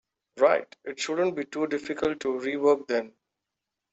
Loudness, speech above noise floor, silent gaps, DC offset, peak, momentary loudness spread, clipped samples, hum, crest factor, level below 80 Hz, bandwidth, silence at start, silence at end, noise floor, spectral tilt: -27 LUFS; 60 dB; none; under 0.1%; -8 dBFS; 8 LU; under 0.1%; none; 20 dB; -66 dBFS; 8.2 kHz; 0.35 s; 0.85 s; -86 dBFS; -4 dB/octave